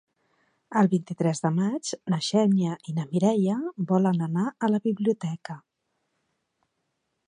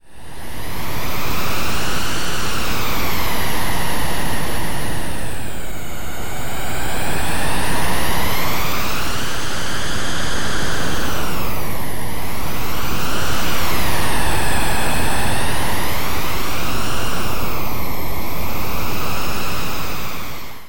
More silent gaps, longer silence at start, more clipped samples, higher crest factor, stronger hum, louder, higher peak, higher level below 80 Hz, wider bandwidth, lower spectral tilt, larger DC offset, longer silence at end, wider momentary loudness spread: neither; first, 0.7 s vs 0 s; neither; first, 18 dB vs 12 dB; neither; second, -26 LUFS vs -23 LUFS; second, -8 dBFS vs -4 dBFS; second, -74 dBFS vs -32 dBFS; second, 10 kHz vs 17 kHz; first, -6.5 dB/octave vs -3.5 dB/octave; second, under 0.1% vs 20%; first, 1.7 s vs 0 s; about the same, 8 LU vs 7 LU